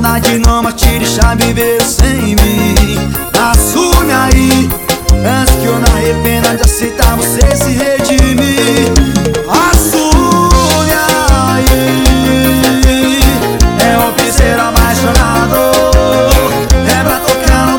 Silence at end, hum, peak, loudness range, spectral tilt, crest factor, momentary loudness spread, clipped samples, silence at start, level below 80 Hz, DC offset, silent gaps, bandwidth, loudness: 0 s; none; 0 dBFS; 1 LU; -4.5 dB/octave; 8 dB; 3 LU; 3%; 0 s; -14 dBFS; under 0.1%; none; over 20 kHz; -9 LUFS